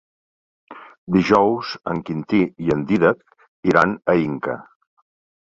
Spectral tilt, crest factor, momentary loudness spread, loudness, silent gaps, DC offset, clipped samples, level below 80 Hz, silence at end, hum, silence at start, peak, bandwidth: -7.5 dB/octave; 20 dB; 11 LU; -20 LUFS; 0.98-1.07 s, 3.48-3.63 s; under 0.1%; under 0.1%; -52 dBFS; 0.95 s; none; 0.7 s; 0 dBFS; 7.8 kHz